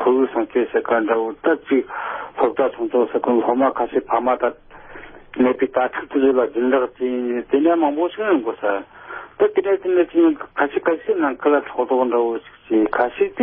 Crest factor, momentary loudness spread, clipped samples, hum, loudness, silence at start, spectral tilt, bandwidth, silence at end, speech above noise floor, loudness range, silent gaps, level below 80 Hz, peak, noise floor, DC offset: 16 dB; 7 LU; under 0.1%; none; -19 LUFS; 0 s; -10 dB/octave; 3.7 kHz; 0 s; 20 dB; 1 LU; none; -58 dBFS; -4 dBFS; -39 dBFS; under 0.1%